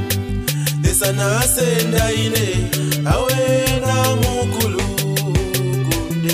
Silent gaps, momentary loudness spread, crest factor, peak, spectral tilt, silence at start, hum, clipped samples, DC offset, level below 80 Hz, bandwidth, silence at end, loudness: none; 4 LU; 14 dB; -2 dBFS; -4.5 dB/octave; 0 s; none; under 0.1%; under 0.1%; -30 dBFS; 16 kHz; 0 s; -17 LUFS